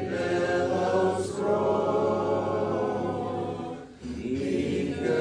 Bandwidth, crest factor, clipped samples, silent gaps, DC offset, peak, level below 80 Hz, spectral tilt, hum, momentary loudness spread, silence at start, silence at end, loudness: 10.5 kHz; 14 dB; under 0.1%; none; under 0.1%; -14 dBFS; -56 dBFS; -6.5 dB/octave; none; 9 LU; 0 s; 0 s; -27 LUFS